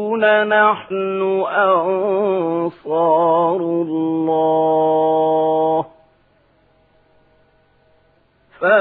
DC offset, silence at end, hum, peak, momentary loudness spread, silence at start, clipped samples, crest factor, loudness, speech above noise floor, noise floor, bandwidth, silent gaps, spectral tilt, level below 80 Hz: under 0.1%; 0 s; none; 0 dBFS; 7 LU; 0 s; under 0.1%; 16 dB; -17 LUFS; 41 dB; -57 dBFS; 4.1 kHz; none; -10 dB/octave; -68 dBFS